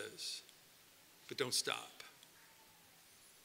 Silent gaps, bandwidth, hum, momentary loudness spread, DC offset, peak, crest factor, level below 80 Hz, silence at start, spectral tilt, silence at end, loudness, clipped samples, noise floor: none; 16 kHz; none; 25 LU; under 0.1%; -20 dBFS; 26 dB; -88 dBFS; 0 s; -1 dB/octave; 0 s; -41 LUFS; under 0.1%; -65 dBFS